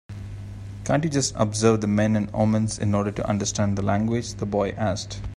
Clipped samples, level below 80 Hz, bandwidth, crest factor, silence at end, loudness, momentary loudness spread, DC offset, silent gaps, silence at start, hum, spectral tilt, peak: under 0.1%; -44 dBFS; 11.5 kHz; 20 dB; 0 s; -24 LUFS; 13 LU; under 0.1%; none; 0.1 s; none; -5.5 dB/octave; -4 dBFS